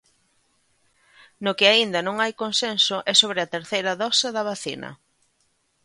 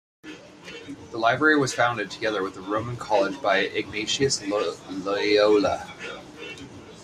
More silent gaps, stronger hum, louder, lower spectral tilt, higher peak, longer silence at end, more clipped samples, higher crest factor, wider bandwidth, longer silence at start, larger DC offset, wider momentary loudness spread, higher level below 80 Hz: neither; neither; first, -21 LUFS vs -24 LUFS; second, -2 dB/octave vs -3.5 dB/octave; first, -2 dBFS vs -6 dBFS; first, 0.9 s vs 0 s; neither; about the same, 22 dB vs 20 dB; about the same, 11.5 kHz vs 12.5 kHz; first, 1.4 s vs 0.25 s; neither; second, 13 LU vs 20 LU; second, -72 dBFS vs -60 dBFS